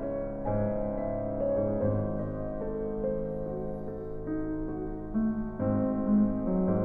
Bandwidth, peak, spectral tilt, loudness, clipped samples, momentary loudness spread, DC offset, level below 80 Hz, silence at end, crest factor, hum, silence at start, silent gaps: 2.5 kHz; -16 dBFS; -13 dB/octave; -31 LUFS; under 0.1%; 9 LU; under 0.1%; -42 dBFS; 0 s; 14 dB; none; 0 s; none